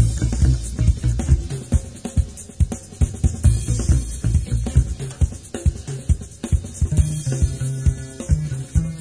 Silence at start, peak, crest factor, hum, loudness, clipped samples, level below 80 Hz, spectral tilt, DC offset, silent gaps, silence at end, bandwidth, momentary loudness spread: 0 s; -4 dBFS; 16 dB; none; -22 LUFS; under 0.1%; -22 dBFS; -6.5 dB/octave; 0.1%; none; 0 s; 11 kHz; 5 LU